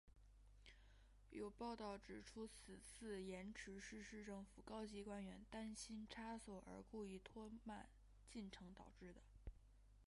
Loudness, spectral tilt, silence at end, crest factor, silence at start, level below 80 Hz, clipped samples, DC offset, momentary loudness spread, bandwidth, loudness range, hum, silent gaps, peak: -56 LUFS; -4.5 dB/octave; 0 s; 16 dB; 0.05 s; -68 dBFS; under 0.1%; under 0.1%; 11 LU; 11.5 kHz; 3 LU; none; none; -40 dBFS